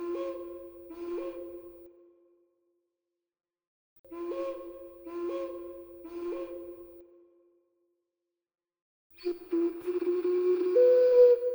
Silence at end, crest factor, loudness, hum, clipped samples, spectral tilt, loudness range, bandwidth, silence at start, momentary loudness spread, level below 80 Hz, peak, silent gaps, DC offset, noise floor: 0 s; 20 dB; -28 LUFS; none; under 0.1%; -6.5 dB/octave; 16 LU; over 20 kHz; 0 s; 25 LU; -70 dBFS; -12 dBFS; 3.67-4.04 s, 8.82-9.10 s; under 0.1%; -88 dBFS